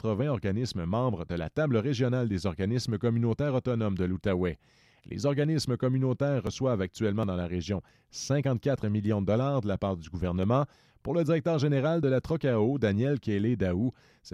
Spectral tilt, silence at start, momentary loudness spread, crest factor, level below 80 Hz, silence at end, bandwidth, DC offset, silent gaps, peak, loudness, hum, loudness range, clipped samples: -7 dB/octave; 0.05 s; 6 LU; 14 dB; -54 dBFS; 0.05 s; 12 kHz; under 0.1%; none; -14 dBFS; -29 LUFS; none; 2 LU; under 0.1%